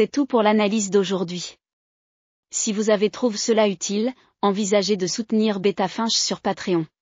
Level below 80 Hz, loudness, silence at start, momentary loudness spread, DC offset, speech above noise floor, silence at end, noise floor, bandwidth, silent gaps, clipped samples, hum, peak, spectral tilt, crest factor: -68 dBFS; -22 LUFS; 0 s; 6 LU; under 0.1%; over 69 dB; 0.15 s; under -90 dBFS; 9.4 kHz; 1.73-2.43 s; under 0.1%; none; -6 dBFS; -4 dB/octave; 16 dB